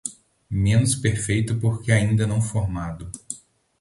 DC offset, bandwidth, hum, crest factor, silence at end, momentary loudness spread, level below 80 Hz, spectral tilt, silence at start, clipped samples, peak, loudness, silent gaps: under 0.1%; 11.5 kHz; none; 18 dB; 0.45 s; 15 LU; -40 dBFS; -5.5 dB/octave; 0.05 s; under 0.1%; -4 dBFS; -22 LUFS; none